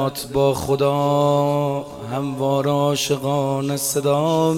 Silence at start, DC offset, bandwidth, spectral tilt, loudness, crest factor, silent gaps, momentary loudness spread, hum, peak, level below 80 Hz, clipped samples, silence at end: 0 s; under 0.1%; 17 kHz; -5.5 dB/octave; -20 LUFS; 14 dB; none; 6 LU; none; -6 dBFS; -50 dBFS; under 0.1%; 0 s